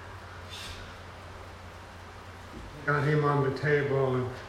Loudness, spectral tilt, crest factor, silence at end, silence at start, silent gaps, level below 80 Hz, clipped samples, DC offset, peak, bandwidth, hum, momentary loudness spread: -28 LUFS; -7 dB/octave; 18 dB; 0 s; 0 s; none; -54 dBFS; under 0.1%; under 0.1%; -12 dBFS; 14 kHz; none; 20 LU